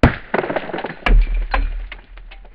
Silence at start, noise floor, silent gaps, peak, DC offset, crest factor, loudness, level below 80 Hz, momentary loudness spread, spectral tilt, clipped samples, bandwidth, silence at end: 0.05 s; -37 dBFS; none; 0 dBFS; under 0.1%; 18 dB; -21 LUFS; -20 dBFS; 19 LU; -8 dB/octave; under 0.1%; 5.4 kHz; 0.1 s